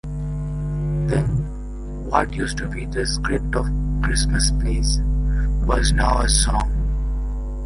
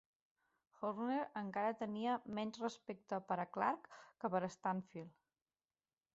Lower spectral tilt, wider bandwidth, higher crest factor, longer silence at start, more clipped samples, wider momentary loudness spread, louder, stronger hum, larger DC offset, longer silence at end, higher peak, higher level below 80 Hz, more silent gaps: about the same, -4.5 dB/octave vs -5 dB/octave; first, 11.5 kHz vs 8 kHz; about the same, 18 dB vs 20 dB; second, 0.05 s vs 0.8 s; neither; about the same, 9 LU vs 10 LU; first, -22 LUFS vs -42 LUFS; neither; neither; second, 0 s vs 1.05 s; first, -2 dBFS vs -22 dBFS; first, -22 dBFS vs -84 dBFS; neither